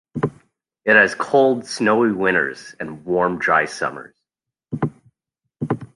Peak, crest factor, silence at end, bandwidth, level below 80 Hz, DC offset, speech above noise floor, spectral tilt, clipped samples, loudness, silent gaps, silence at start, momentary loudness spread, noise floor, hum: 0 dBFS; 20 dB; 0.1 s; 11.5 kHz; -58 dBFS; under 0.1%; 65 dB; -5.5 dB/octave; under 0.1%; -19 LUFS; none; 0.15 s; 17 LU; -84 dBFS; none